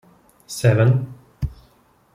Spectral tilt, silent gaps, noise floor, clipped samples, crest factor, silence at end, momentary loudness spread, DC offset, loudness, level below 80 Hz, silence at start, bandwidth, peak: -6.5 dB/octave; none; -57 dBFS; under 0.1%; 18 dB; 0.6 s; 17 LU; under 0.1%; -20 LUFS; -40 dBFS; 0.5 s; 15 kHz; -4 dBFS